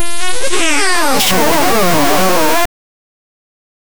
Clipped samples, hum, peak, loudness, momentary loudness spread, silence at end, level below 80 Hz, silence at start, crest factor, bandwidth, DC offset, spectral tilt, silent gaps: under 0.1%; none; 0 dBFS; -12 LUFS; 6 LU; 1.35 s; -38 dBFS; 0 s; 14 dB; over 20 kHz; 20%; -2.5 dB/octave; none